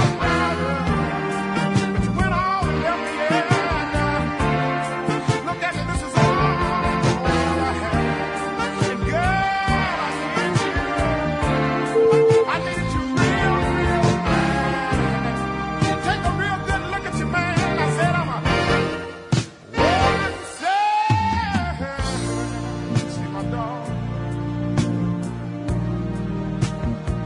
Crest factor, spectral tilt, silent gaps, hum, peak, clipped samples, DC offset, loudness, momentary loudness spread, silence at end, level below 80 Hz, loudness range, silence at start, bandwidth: 16 dB; -6 dB/octave; none; none; -4 dBFS; under 0.1%; under 0.1%; -21 LUFS; 8 LU; 0 s; -36 dBFS; 6 LU; 0 s; 11 kHz